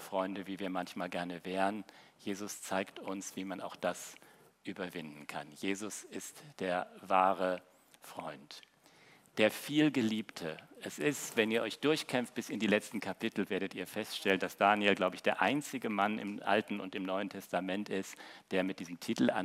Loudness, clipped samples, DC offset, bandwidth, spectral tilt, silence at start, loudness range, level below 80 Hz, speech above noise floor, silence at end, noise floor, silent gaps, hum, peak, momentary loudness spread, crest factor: -35 LUFS; under 0.1%; under 0.1%; 16 kHz; -4 dB/octave; 0 s; 9 LU; -86 dBFS; 27 dB; 0 s; -63 dBFS; none; none; -12 dBFS; 15 LU; 24 dB